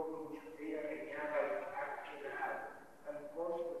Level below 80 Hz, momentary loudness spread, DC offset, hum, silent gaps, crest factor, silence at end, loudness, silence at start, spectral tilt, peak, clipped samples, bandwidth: -80 dBFS; 10 LU; under 0.1%; none; none; 18 dB; 0 s; -43 LUFS; 0 s; -5.5 dB/octave; -24 dBFS; under 0.1%; 13 kHz